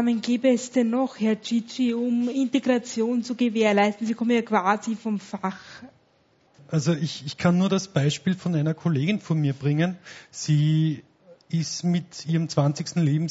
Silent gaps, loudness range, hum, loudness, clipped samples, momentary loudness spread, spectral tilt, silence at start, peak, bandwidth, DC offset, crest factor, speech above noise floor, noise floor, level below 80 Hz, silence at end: none; 3 LU; none; -24 LUFS; under 0.1%; 7 LU; -6 dB/octave; 0 s; -6 dBFS; 8 kHz; under 0.1%; 18 dB; 39 dB; -63 dBFS; -64 dBFS; 0 s